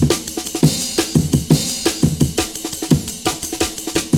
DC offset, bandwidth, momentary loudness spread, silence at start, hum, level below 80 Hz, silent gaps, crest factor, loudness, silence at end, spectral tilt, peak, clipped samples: 0.2%; 19 kHz; 6 LU; 0 s; none; -36 dBFS; none; 18 dB; -18 LUFS; 0 s; -4.5 dB/octave; 0 dBFS; under 0.1%